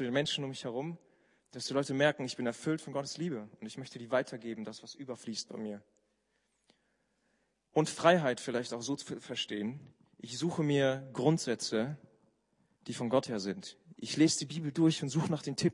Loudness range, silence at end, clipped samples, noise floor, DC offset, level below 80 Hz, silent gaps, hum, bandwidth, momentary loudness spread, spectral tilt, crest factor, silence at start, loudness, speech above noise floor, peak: 8 LU; 0 s; under 0.1%; -78 dBFS; under 0.1%; -78 dBFS; none; none; 11 kHz; 16 LU; -5 dB/octave; 24 dB; 0 s; -34 LUFS; 45 dB; -10 dBFS